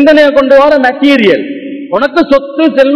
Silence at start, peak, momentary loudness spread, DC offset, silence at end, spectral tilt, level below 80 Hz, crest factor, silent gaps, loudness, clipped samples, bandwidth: 0 s; 0 dBFS; 9 LU; under 0.1%; 0 s; -6 dB/octave; -42 dBFS; 6 dB; none; -7 LUFS; 8%; 5.4 kHz